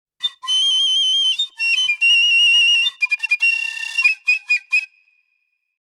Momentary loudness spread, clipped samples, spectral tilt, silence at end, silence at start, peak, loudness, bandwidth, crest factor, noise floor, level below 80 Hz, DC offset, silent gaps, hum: 9 LU; under 0.1%; 7.5 dB/octave; 0.95 s; 0.2 s; -4 dBFS; -14 LUFS; 13 kHz; 14 dB; -69 dBFS; -88 dBFS; under 0.1%; none; none